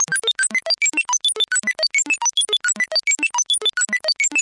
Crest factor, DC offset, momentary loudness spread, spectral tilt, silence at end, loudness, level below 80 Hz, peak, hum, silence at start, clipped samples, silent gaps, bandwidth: 12 dB; under 0.1%; 1 LU; 2 dB/octave; 0 s; -17 LUFS; -78 dBFS; -8 dBFS; none; 0 s; under 0.1%; none; 11.5 kHz